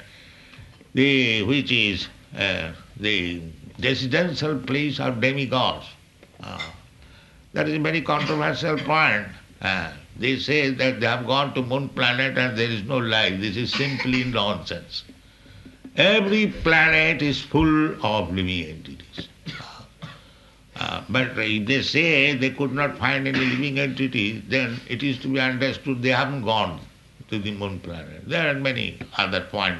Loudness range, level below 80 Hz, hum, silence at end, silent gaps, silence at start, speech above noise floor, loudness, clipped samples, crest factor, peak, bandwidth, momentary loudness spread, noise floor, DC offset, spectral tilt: 6 LU; -48 dBFS; none; 0 s; none; 0 s; 28 dB; -22 LUFS; under 0.1%; 20 dB; -4 dBFS; 12 kHz; 17 LU; -51 dBFS; under 0.1%; -5.5 dB/octave